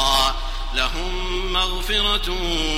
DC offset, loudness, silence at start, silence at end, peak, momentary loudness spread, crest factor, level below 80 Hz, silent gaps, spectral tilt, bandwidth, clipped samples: under 0.1%; -21 LUFS; 0 s; 0 s; -4 dBFS; 7 LU; 18 dB; -26 dBFS; none; -2.5 dB/octave; 16 kHz; under 0.1%